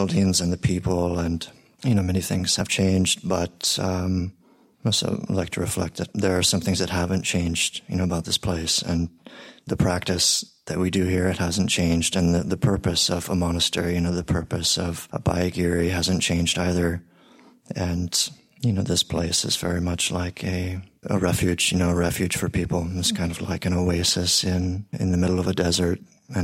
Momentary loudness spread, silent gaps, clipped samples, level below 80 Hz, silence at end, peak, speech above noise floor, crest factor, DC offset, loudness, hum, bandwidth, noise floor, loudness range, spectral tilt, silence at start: 7 LU; none; under 0.1%; -42 dBFS; 0 s; -6 dBFS; 30 dB; 16 dB; under 0.1%; -23 LUFS; none; 16.5 kHz; -53 dBFS; 2 LU; -4 dB/octave; 0 s